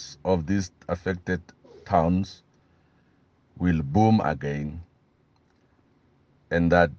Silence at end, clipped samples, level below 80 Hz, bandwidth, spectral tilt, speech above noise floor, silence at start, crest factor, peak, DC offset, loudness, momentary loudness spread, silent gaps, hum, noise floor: 0.05 s; under 0.1%; -50 dBFS; 7.2 kHz; -7.5 dB/octave; 40 dB; 0 s; 22 dB; -6 dBFS; under 0.1%; -25 LUFS; 12 LU; none; none; -64 dBFS